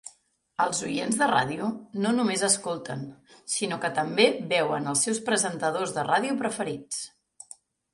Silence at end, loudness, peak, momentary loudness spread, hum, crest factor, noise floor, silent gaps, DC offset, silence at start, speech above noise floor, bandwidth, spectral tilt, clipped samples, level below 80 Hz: 0.85 s; -26 LUFS; -6 dBFS; 15 LU; none; 22 dB; -62 dBFS; none; under 0.1%; 0.05 s; 35 dB; 11.5 kHz; -3 dB/octave; under 0.1%; -70 dBFS